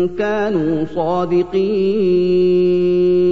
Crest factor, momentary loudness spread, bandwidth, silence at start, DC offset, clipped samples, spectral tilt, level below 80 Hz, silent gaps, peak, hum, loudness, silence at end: 8 dB; 5 LU; 6.2 kHz; 0 s; 2%; under 0.1%; -8.5 dB/octave; -46 dBFS; none; -6 dBFS; 50 Hz at -45 dBFS; -16 LUFS; 0 s